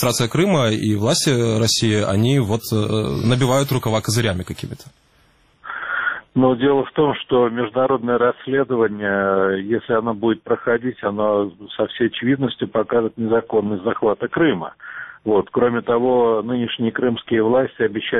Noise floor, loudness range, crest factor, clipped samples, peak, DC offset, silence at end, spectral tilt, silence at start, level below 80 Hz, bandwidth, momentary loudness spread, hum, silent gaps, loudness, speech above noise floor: -56 dBFS; 3 LU; 16 dB; under 0.1%; -4 dBFS; under 0.1%; 0 s; -5.5 dB/octave; 0 s; -50 dBFS; 14 kHz; 7 LU; none; none; -19 LUFS; 38 dB